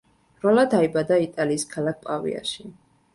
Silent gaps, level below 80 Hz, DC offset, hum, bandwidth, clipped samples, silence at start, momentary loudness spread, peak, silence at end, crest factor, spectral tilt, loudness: none; -62 dBFS; under 0.1%; none; 11.5 kHz; under 0.1%; 0.45 s; 11 LU; -6 dBFS; 0.45 s; 18 dB; -5 dB/octave; -23 LUFS